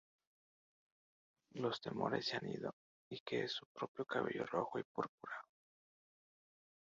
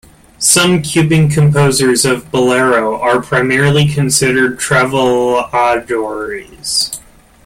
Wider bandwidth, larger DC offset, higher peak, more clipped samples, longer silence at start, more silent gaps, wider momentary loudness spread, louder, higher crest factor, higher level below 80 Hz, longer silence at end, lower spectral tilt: second, 7.4 kHz vs 16 kHz; neither; second, -22 dBFS vs 0 dBFS; neither; first, 1.55 s vs 0.4 s; first, 2.73-3.11 s, 3.20-3.26 s, 3.66-3.75 s, 3.88-3.95 s, 4.85-4.95 s, 5.09-5.18 s vs none; about the same, 10 LU vs 8 LU; second, -43 LUFS vs -12 LUFS; first, 22 dB vs 12 dB; second, -82 dBFS vs -42 dBFS; first, 1.4 s vs 0.45 s; about the same, -3 dB/octave vs -4 dB/octave